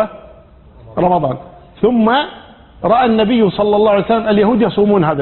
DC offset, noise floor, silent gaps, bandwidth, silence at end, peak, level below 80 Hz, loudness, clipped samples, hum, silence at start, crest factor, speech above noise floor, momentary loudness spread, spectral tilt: under 0.1%; -41 dBFS; none; 4.3 kHz; 0 s; 0 dBFS; -42 dBFS; -13 LUFS; under 0.1%; none; 0 s; 14 dB; 29 dB; 10 LU; -12 dB/octave